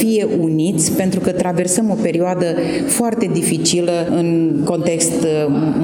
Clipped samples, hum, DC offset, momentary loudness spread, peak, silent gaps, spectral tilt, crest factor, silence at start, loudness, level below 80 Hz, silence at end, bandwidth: under 0.1%; none; under 0.1%; 2 LU; -2 dBFS; none; -5 dB/octave; 14 dB; 0 s; -16 LUFS; -52 dBFS; 0 s; over 20 kHz